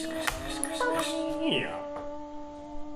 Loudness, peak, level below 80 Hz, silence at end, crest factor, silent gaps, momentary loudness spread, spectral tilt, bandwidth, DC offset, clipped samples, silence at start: -31 LUFS; -8 dBFS; -48 dBFS; 0 s; 24 dB; none; 14 LU; -3 dB/octave; 16 kHz; under 0.1%; under 0.1%; 0 s